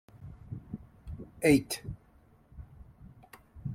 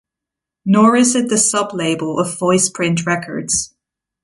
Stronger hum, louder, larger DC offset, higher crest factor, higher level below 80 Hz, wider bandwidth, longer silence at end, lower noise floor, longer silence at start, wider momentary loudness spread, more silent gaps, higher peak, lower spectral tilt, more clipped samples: neither; second, -30 LUFS vs -15 LUFS; neither; first, 24 dB vs 16 dB; about the same, -54 dBFS vs -54 dBFS; first, 16.5 kHz vs 11.5 kHz; second, 0 s vs 0.55 s; second, -62 dBFS vs -84 dBFS; second, 0.15 s vs 0.65 s; first, 28 LU vs 8 LU; neither; second, -10 dBFS vs 0 dBFS; first, -5.5 dB/octave vs -4 dB/octave; neither